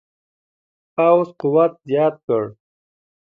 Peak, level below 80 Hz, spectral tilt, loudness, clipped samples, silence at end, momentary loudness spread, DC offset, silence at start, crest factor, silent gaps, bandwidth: -2 dBFS; -70 dBFS; -9.5 dB/octave; -18 LUFS; under 0.1%; 0.7 s; 8 LU; under 0.1%; 1 s; 18 dB; 2.24-2.28 s; 4.9 kHz